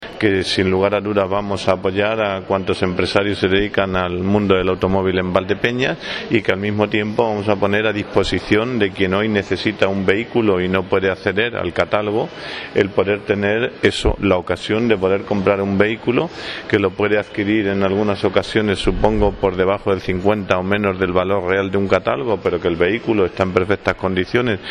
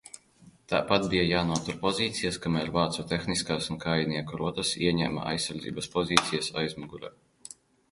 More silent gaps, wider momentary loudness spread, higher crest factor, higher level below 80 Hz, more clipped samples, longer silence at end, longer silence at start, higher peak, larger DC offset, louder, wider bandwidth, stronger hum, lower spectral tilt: neither; second, 3 LU vs 17 LU; second, 18 dB vs 28 dB; first, -36 dBFS vs -52 dBFS; neither; second, 0 s vs 0.8 s; second, 0 s vs 0.15 s; about the same, 0 dBFS vs 0 dBFS; neither; first, -18 LUFS vs -28 LUFS; about the same, 11.5 kHz vs 11.5 kHz; neither; first, -6.5 dB/octave vs -4 dB/octave